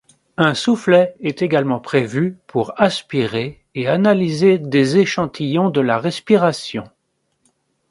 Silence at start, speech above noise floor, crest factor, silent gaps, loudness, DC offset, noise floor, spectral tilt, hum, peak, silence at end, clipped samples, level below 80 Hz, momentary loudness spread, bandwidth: 0.4 s; 52 dB; 18 dB; none; -17 LUFS; under 0.1%; -69 dBFS; -6 dB/octave; none; 0 dBFS; 1.05 s; under 0.1%; -58 dBFS; 9 LU; 11.5 kHz